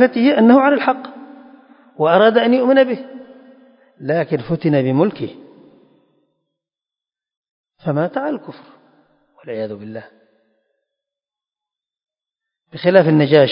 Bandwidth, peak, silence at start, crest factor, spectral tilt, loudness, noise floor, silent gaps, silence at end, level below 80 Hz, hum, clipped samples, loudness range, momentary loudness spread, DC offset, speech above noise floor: 5.4 kHz; 0 dBFS; 0 s; 18 dB; -10.5 dB/octave; -15 LUFS; -90 dBFS; 7.37-7.42 s, 7.51-7.64 s; 0 s; -64 dBFS; none; under 0.1%; 18 LU; 19 LU; under 0.1%; 75 dB